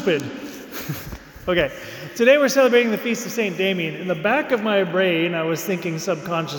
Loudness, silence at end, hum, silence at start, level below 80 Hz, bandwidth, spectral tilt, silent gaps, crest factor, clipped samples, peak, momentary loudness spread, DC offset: -20 LUFS; 0 s; none; 0 s; -50 dBFS; 19.5 kHz; -4.5 dB/octave; none; 18 dB; under 0.1%; -4 dBFS; 16 LU; under 0.1%